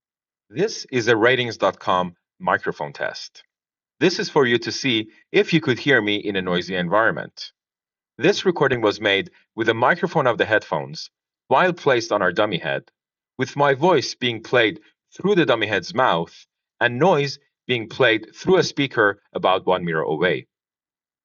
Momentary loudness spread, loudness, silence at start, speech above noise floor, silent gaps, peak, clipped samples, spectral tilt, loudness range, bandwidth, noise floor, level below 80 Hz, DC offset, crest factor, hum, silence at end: 10 LU; -20 LUFS; 0.55 s; over 70 dB; none; -4 dBFS; under 0.1%; -3 dB/octave; 2 LU; 7.4 kHz; under -90 dBFS; -66 dBFS; under 0.1%; 18 dB; none; 0.8 s